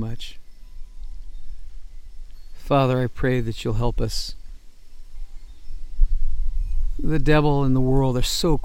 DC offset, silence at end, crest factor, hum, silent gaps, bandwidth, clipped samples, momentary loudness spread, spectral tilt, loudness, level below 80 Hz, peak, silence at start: under 0.1%; 0 s; 18 dB; none; none; 16 kHz; under 0.1%; 25 LU; -6 dB/octave; -23 LUFS; -26 dBFS; -4 dBFS; 0 s